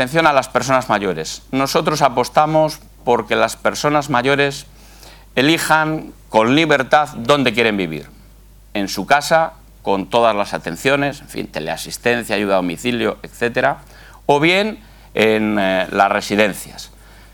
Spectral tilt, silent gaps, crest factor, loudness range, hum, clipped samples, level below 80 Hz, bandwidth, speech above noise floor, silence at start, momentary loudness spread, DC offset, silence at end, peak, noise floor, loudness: -4.5 dB/octave; none; 18 dB; 3 LU; none; under 0.1%; -46 dBFS; 19 kHz; 27 dB; 0 s; 11 LU; under 0.1%; 0.45 s; 0 dBFS; -44 dBFS; -17 LUFS